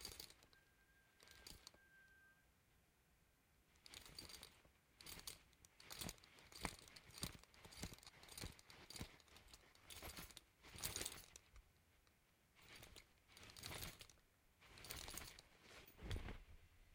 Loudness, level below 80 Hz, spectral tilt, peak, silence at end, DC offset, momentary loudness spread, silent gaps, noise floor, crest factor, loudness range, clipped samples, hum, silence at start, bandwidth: -56 LUFS; -66 dBFS; -2.5 dB/octave; -24 dBFS; 0 s; under 0.1%; 14 LU; none; -78 dBFS; 34 dB; 9 LU; under 0.1%; none; 0 s; 16.5 kHz